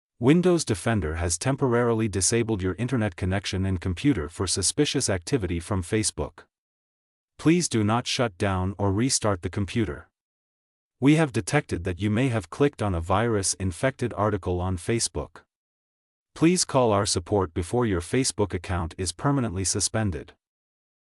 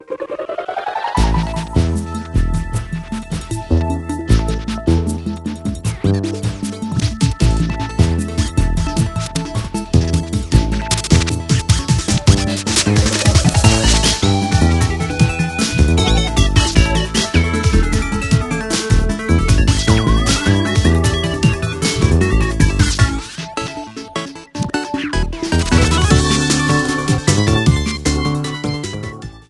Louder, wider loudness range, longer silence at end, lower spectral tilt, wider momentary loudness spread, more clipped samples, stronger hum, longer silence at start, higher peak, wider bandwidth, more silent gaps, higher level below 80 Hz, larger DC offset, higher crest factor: second, -25 LUFS vs -16 LUFS; second, 2 LU vs 6 LU; first, 0.95 s vs 0.1 s; about the same, -4.5 dB/octave vs -5 dB/octave; second, 7 LU vs 11 LU; neither; neither; first, 0.2 s vs 0 s; second, -8 dBFS vs 0 dBFS; about the same, 13.5 kHz vs 12.5 kHz; first, 6.58-7.28 s, 10.21-10.91 s, 15.55-16.26 s vs none; second, -46 dBFS vs -22 dBFS; neither; about the same, 18 dB vs 16 dB